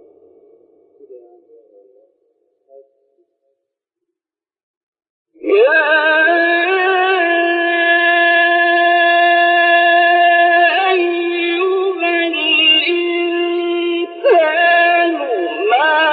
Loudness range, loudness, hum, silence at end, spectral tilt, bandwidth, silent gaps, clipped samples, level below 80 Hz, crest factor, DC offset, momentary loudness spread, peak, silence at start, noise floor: 4 LU; -12 LUFS; none; 0 s; -4.5 dB/octave; 4.8 kHz; 4.63-4.92 s, 5.10-5.25 s; under 0.1%; -76 dBFS; 14 dB; under 0.1%; 7 LU; -2 dBFS; 1.1 s; -88 dBFS